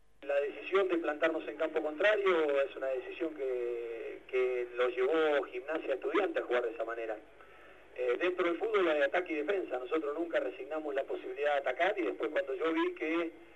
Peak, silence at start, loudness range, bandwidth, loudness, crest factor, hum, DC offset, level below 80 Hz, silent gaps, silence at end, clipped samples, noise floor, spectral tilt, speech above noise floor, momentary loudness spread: -16 dBFS; 0.2 s; 2 LU; 8.8 kHz; -33 LUFS; 18 dB; 50 Hz at -70 dBFS; under 0.1%; -72 dBFS; none; 0.1 s; under 0.1%; -57 dBFS; -4.5 dB/octave; 24 dB; 8 LU